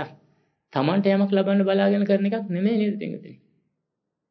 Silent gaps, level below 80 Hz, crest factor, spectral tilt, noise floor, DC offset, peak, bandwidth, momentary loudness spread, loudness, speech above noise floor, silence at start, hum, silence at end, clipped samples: none; -80 dBFS; 16 dB; -10 dB/octave; -81 dBFS; under 0.1%; -8 dBFS; 5.4 kHz; 12 LU; -22 LUFS; 60 dB; 0 s; none; 0.95 s; under 0.1%